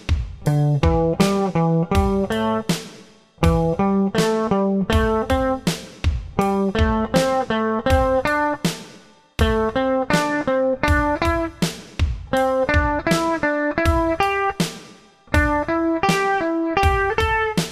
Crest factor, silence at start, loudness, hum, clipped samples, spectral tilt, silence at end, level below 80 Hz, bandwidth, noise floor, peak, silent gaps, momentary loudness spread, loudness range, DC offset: 18 dB; 0 s; -20 LUFS; none; under 0.1%; -6 dB/octave; 0 s; -30 dBFS; 15.5 kHz; -47 dBFS; -2 dBFS; none; 7 LU; 0 LU; under 0.1%